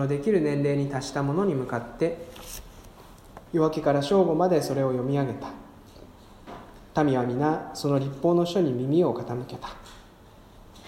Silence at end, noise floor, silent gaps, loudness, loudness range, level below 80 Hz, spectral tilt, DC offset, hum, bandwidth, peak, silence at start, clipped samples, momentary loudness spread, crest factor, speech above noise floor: 0 s; -51 dBFS; none; -25 LUFS; 3 LU; -52 dBFS; -7 dB/octave; under 0.1%; none; 16 kHz; -8 dBFS; 0 s; under 0.1%; 18 LU; 18 dB; 26 dB